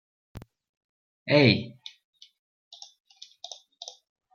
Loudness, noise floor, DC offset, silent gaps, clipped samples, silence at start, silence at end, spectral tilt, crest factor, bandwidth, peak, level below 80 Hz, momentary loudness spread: -22 LUFS; -48 dBFS; under 0.1%; 0.69-1.26 s; under 0.1%; 0.35 s; 2.65 s; -6 dB/octave; 26 dB; 7 kHz; -6 dBFS; -66 dBFS; 29 LU